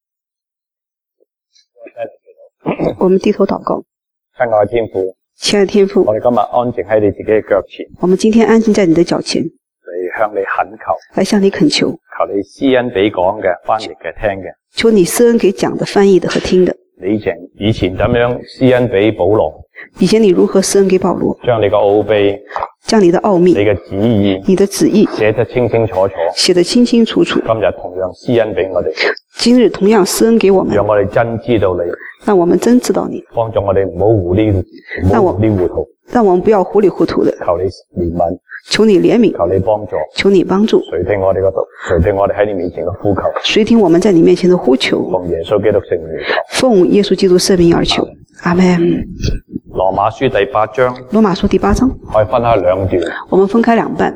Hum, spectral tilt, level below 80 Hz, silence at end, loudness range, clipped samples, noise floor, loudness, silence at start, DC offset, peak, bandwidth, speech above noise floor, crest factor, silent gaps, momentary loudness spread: none; -5.5 dB/octave; -36 dBFS; 0 s; 3 LU; under 0.1%; -86 dBFS; -12 LUFS; 1.8 s; under 0.1%; 0 dBFS; 14 kHz; 74 dB; 12 dB; none; 9 LU